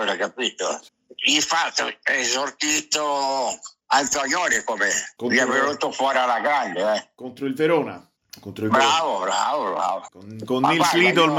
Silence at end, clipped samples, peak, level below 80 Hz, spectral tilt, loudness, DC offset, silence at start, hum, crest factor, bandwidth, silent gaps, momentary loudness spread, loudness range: 0 s; under 0.1%; -6 dBFS; -66 dBFS; -2 dB/octave; -21 LUFS; under 0.1%; 0 s; none; 16 dB; 16 kHz; none; 12 LU; 2 LU